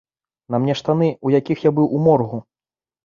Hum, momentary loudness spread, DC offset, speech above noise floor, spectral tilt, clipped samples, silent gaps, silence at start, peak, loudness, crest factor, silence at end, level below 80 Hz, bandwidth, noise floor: none; 8 LU; under 0.1%; over 73 dB; -8.5 dB/octave; under 0.1%; none; 0.5 s; -4 dBFS; -18 LUFS; 16 dB; 0.65 s; -58 dBFS; 7.2 kHz; under -90 dBFS